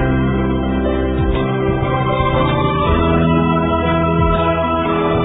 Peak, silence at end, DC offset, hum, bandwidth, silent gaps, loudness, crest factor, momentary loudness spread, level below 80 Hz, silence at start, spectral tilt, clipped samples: -2 dBFS; 0 s; under 0.1%; none; 4 kHz; none; -16 LUFS; 12 dB; 3 LU; -24 dBFS; 0 s; -11.5 dB/octave; under 0.1%